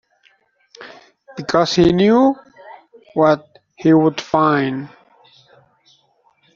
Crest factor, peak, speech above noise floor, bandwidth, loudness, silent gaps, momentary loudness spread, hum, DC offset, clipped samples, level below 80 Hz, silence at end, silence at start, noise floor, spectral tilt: 16 dB; -2 dBFS; 45 dB; 7.4 kHz; -16 LUFS; none; 20 LU; none; under 0.1%; under 0.1%; -50 dBFS; 1.7 s; 0.8 s; -59 dBFS; -6.5 dB/octave